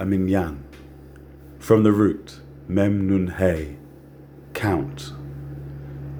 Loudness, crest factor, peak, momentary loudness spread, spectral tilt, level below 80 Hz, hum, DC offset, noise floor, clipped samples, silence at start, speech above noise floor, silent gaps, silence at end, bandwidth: -22 LUFS; 22 dB; -2 dBFS; 23 LU; -8 dB/octave; -44 dBFS; none; under 0.1%; -44 dBFS; under 0.1%; 0 s; 24 dB; none; 0 s; over 20 kHz